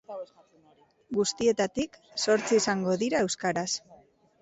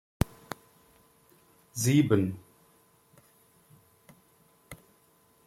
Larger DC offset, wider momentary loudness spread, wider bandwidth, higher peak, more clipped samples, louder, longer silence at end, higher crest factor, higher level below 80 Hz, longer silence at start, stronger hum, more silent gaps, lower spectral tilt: neither; second, 10 LU vs 27 LU; second, 8.2 kHz vs 16.5 kHz; second, -14 dBFS vs -8 dBFS; neither; about the same, -28 LUFS vs -28 LUFS; second, 0.45 s vs 0.7 s; second, 16 dB vs 26 dB; second, -64 dBFS vs -52 dBFS; second, 0.1 s vs 1.75 s; neither; neither; second, -3.5 dB/octave vs -6 dB/octave